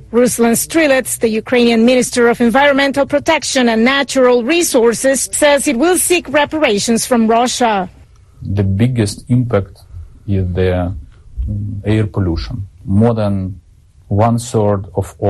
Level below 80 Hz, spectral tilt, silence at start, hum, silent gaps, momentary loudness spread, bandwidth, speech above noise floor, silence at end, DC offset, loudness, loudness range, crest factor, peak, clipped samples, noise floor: -34 dBFS; -4.5 dB/octave; 0 s; none; none; 11 LU; 12.5 kHz; 32 dB; 0 s; under 0.1%; -13 LUFS; 6 LU; 12 dB; -2 dBFS; under 0.1%; -45 dBFS